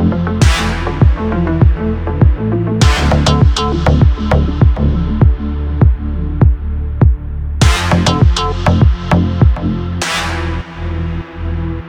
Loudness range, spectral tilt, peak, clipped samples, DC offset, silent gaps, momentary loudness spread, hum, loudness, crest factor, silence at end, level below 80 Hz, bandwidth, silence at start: 2 LU; -6 dB/octave; 0 dBFS; under 0.1%; under 0.1%; none; 9 LU; none; -14 LUFS; 12 dB; 0 s; -16 dBFS; 11.5 kHz; 0 s